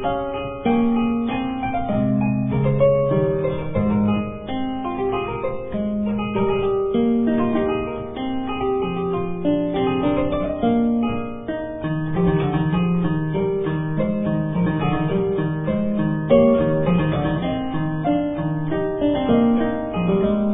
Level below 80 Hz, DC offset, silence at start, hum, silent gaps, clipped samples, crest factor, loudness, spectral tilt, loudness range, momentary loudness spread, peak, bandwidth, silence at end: -40 dBFS; 0.3%; 0 s; none; none; under 0.1%; 18 dB; -21 LUFS; -12 dB/octave; 2 LU; 8 LU; -2 dBFS; 3.9 kHz; 0 s